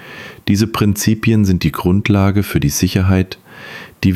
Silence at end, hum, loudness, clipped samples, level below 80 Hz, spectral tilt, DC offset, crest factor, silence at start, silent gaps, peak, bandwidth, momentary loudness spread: 0 s; none; -15 LUFS; under 0.1%; -36 dBFS; -5.5 dB/octave; under 0.1%; 14 dB; 0 s; none; 0 dBFS; 15.5 kHz; 18 LU